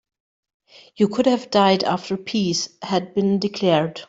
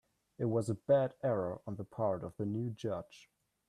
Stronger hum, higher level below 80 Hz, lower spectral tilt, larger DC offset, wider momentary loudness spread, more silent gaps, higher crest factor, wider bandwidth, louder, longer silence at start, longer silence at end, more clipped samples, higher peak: neither; first, -62 dBFS vs -72 dBFS; second, -5 dB/octave vs -8 dB/octave; neither; second, 7 LU vs 12 LU; neither; about the same, 18 dB vs 18 dB; second, 7.8 kHz vs 11.5 kHz; first, -20 LUFS vs -36 LUFS; first, 1 s vs 0.4 s; second, 0.05 s vs 0.5 s; neither; first, -4 dBFS vs -18 dBFS